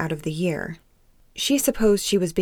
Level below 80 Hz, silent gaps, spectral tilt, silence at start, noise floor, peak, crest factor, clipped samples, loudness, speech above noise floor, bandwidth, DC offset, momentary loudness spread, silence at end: -44 dBFS; none; -4.5 dB/octave; 0 s; -57 dBFS; -6 dBFS; 16 dB; under 0.1%; -22 LUFS; 34 dB; 20 kHz; under 0.1%; 17 LU; 0 s